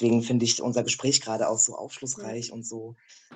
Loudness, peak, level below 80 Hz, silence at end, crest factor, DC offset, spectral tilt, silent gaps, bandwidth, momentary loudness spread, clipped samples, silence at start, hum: -25 LUFS; -6 dBFS; -70 dBFS; 0 s; 20 dB; under 0.1%; -3.5 dB/octave; none; 9.6 kHz; 14 LU; under 0.1%; 0 s; none